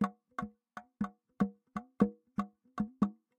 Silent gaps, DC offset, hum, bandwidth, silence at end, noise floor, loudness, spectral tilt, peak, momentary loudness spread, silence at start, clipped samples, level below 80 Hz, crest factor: none; under 0.1%; none; 8.8 kHz; 0.25 s; -54 dBFS; -38 LUFS; -8.5 dB/octave; -12 dBFS; 13 LU; 0 s; under 0.1%; -64 dBFS; 26 dB